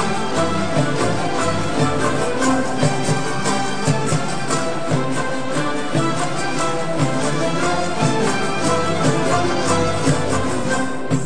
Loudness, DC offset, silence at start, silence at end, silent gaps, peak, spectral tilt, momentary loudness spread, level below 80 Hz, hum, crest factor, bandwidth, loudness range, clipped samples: -20 LUFS; 7%; 0 s; 0 s; none; -4 dBFS; -5 dB/octave; 3 LU; -44 dBFS; none; 16 dB; 10 kHz; 2 LU; under 0.1%